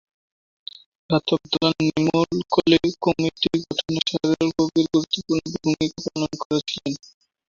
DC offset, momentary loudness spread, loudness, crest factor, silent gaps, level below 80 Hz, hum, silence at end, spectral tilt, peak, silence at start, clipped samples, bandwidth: under 0.1%; 9 LU; -22 LUFS; 20 dB; 6.45-6.50 s; -54 dBFS; none; 0.6 s; -5.5 dB/octave; -2 dBFS; 1.1 s; under 0.1%; 7.4 kHz